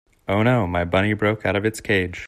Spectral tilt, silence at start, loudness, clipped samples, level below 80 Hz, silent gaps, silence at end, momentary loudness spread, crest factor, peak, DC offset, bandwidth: -6.5 dB/octave; 0.3 s; -21 LUFS; under 0.1%; -50 dBFS; none; 0 s; 3 LU; 16 dB; -6 dBFS; under 0.1%; 14.5 kHz